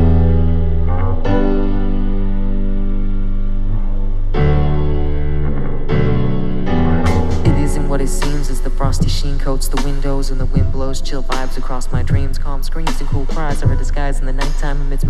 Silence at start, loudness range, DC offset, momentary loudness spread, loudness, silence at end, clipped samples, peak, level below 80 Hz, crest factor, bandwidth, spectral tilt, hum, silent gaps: 0 s; 3 LU; under 0.1%; 7 LU; -19 LUFS; 0 s; under 0.1%; 0 dBFS; -14 dBFS; 12 dB; 12 kHz; -6.5 dB/octave; none; none